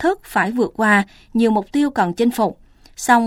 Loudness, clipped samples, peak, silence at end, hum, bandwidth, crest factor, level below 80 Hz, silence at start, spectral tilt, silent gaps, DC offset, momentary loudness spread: -18 LUFS; under 0.1%; 0 dBFS; 0 s; none; 16.5 kHz; 18 dB; -50 dBFS; 0 s; -5 dB/octave; none; under 0.1%; 7 LU